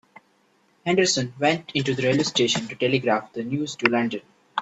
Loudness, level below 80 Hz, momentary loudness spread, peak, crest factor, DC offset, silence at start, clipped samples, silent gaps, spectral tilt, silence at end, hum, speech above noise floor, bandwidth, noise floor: -23 LUFS; -64 dBFS; 8 LU; 0 dBFS; 24 dB; under 0.1%; 0.85 s; under 0.1%; none; -4 dB/octave; 0 s; none; 40 dB; 8.4 kHz; -63 dBFS